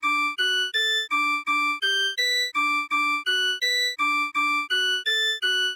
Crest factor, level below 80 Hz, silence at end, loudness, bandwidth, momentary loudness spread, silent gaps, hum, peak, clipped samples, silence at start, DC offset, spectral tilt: 10 dB; -76 dBFS; 0 s; -22 LUFS; 17 kHz; 1 LU; none; none; -14 dBFS; under 0.1%; 0 s; under 0.1%; 2.5 dB/octave